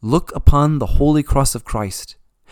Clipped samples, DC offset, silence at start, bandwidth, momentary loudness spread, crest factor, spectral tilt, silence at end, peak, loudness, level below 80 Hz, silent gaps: 0.1%; under 0.1%; 0.05 s; 17.5 kHz; 11 LU; 16 dB; -6.5 dB/octave; 0.4 s; 0 dBFS; -17 LUFS; -22 dBFS; none